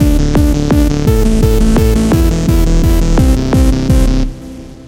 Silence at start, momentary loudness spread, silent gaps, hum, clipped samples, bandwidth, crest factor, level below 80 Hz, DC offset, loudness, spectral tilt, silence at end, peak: 0 s; 3 LU; none; none; under 0.1%; 16.5 kHz; 10 dB; -12 dBFS; under 0.1%; -12 LUFS; -7 dB/octave; 0 s; 0 dBFS